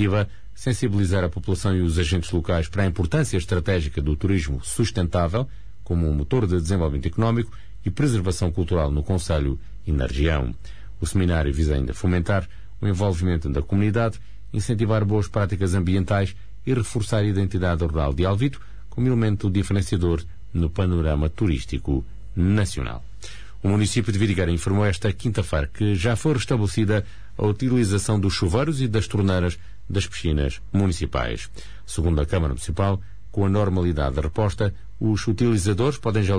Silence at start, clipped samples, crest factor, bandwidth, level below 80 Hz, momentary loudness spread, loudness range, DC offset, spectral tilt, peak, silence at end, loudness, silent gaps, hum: 0 s; under 0.1%; 12 dB; 11 kHz; -32 dBFS; 8 LU; 2 LU; 2%; -6.5 dB/octave; -10 dBFS; 0 s; -23 LUFS; none; none